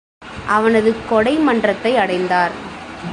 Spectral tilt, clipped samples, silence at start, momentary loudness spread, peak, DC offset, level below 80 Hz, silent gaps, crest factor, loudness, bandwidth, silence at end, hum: -5.5 dB/octave; under 0.1%; 0.2 s; 15 LU; -2 dBFS; under 0.1%; -46 dBFS; none; 14 dB; -16 LUFS; 11 kHz; 0 s; none